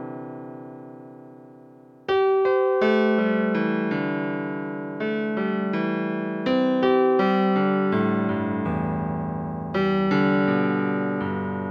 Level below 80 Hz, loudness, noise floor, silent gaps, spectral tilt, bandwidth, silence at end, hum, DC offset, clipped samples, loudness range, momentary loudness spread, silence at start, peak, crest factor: -58 dBFS; -23 LUFS; -48 dBFS; none; -8.5 dB/octave; 6.2 kHz; 0 s; none; under 0.1%; under 0.1%; 3 LU; 15 LU; 0 s; -8 dBFS; 16 dB